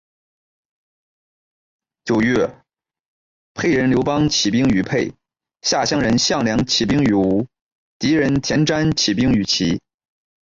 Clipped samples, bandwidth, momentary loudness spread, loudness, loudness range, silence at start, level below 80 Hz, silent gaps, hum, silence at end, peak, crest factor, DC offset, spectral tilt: under 0.1%; 7.8 kHz; 8 LU; -18 LUFS; 6 LU; 2.05 s; -44 dBFS; 3.00-3.55 s, 7.62-8.00 s; none; 0.75 s; -6 dBFS; 14 dB; under 0.1%; -4.5 dB/octave